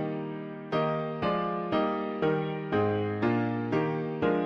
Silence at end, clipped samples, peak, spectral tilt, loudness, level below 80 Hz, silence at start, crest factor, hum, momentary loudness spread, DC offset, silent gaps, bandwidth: 0 s; under 0.1%; -14 dBFS; -9 dB/octave; -30 LUFS; -60 dBFS; 0 s; 14 dB; none; 5 LU; under 0.1%; none; 6.6 kHz